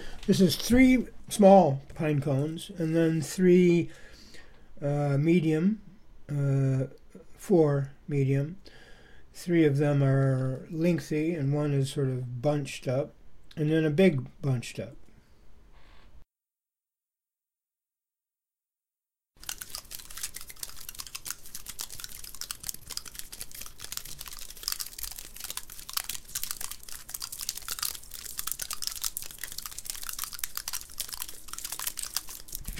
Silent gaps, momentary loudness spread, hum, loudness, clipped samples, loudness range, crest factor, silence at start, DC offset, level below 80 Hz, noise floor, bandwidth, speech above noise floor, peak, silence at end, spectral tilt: none; 17 LU; none; -28 LUFS; under 0.1%; 15 LU; 22 dB; 0 s; under 0.1%; -50 dBFS; under -90 dBFS; 17 kHz; over 65 dB; -6 dBFS; 0 s; -5.5 dB/octave